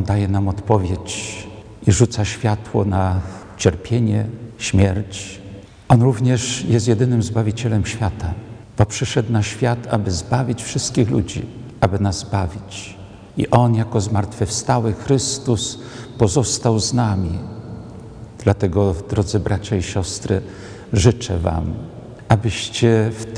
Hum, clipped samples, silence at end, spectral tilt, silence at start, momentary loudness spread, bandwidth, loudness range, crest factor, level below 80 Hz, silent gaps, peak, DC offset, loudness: none; under 0.1%; 0 s; -5.5 dB/octave; 0 s; 16 LU; 10.5 kHz; 3 LU; 18 dB; -38 dBFS; none; 0 dBFS; under 0.1%; -19 LUFS